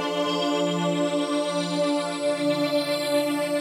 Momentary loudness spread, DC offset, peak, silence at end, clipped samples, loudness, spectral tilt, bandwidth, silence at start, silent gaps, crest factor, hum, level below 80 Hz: 2 LU; under 0.1%; -12 dBFS; 0 s; under 0.1%; -25 LUFS; -4.5 dB/octave; 16 kHz; 0 s; none; 12 dB; none; -76 dBFS